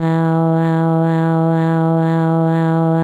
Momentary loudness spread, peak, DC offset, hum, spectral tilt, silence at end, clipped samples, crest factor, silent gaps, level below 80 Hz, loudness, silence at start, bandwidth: 0 LU; -4 dBFS; under 0.1%; none; -10 dB/octave; 0 s; under 0.1%; 10 dB; none; -66 dBFS; -15 LUFS; 0 s; 4.4 kHz